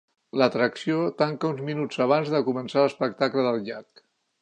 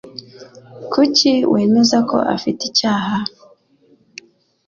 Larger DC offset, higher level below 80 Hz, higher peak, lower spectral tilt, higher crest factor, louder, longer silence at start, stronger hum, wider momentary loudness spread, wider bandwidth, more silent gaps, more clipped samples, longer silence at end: neither; second, -76 dBFS vs -58 dBFS; second, -6 dBFS vs -2 dBFS; first, -6.5 dB/octave vs -4 dB/octave; about the same, 20 dB vs 16 dB; second, -25 LUFS vs -15 LUFS; first, 0.35 s vs 0.05 s; neither; second, 7 LU vs 16 LU; first, 9.4 kHz vs 7.4 kHz; neither; neither; second, 0.6 s vs 1.4 s